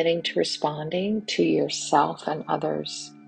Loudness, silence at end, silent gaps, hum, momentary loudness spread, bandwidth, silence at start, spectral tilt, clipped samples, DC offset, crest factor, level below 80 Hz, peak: -25 LUFS; 0.05 s; none; none; 6 LU; 9.6 kHz; 0 s; -4 dB/octave; under 0.1%; under 0.1%; 20 dB; -68 dBFS; -6 dBFS